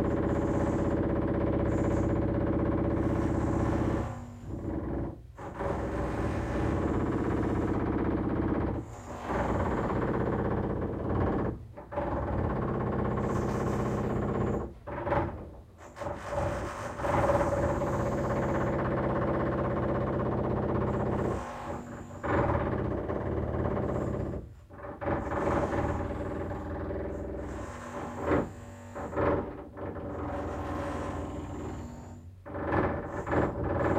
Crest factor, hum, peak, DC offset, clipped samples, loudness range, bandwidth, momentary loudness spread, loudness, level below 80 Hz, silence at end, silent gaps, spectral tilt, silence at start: 18 dB; none; -14 dBFS; under 0.1%; under 0.1%; 5 LU; 14.5 kHz; 11 LU; -31 LUFS; -42 dBFS; 0 s; none; -8.5 dB/octave; 0 s